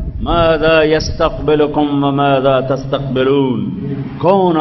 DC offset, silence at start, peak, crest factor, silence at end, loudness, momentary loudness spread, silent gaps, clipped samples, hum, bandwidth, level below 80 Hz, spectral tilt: under 0.1%; 0 s; 0 dBFS; 12 dB; 0 s; -14 LUFS; 7 LU; none; under 0.1%; none; 6.2 kHz; -30 dBFS; -7 dB/octave